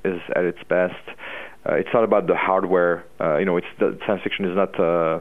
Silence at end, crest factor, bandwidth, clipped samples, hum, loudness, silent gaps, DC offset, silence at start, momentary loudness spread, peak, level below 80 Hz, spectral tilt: 0 s; 18 dB; 4 kHz; under 0.1%; none; -21 LUFS; none; 0.6%; 0.05 s; 8 LU; -4 dBFS; -60 dBFS; -8 dB/octave